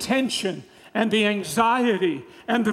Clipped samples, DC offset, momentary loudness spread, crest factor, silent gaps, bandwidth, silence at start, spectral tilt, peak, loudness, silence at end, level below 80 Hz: under 0.1%; under 0.1%; 11 LU; 18 dB; none; 15 kHz; 0 s; -4 dB/octave; -6 dBFS; -23 LUFS; 0 s; -64 dBFS